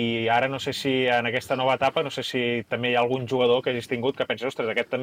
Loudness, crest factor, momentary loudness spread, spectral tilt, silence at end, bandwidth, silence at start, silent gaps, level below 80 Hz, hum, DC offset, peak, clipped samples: -24 LUFS; 14 dB; 5 LU; -5 dB/octave; 0 s; 16 kHz; 0 s; none; -64 dBFS; none; under 0.1%; -10 dBFS; under 0.1%